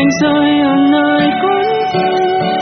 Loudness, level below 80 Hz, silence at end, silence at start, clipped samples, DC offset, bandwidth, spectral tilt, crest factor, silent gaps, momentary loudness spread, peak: -12 LUFS; -52 dBFS; 0 s; 0 s; under 0.1%; under 0.1%; 6.4 kHz; -3.5 dB/octave; 10 dB; none; 3 LU; 0 dBFS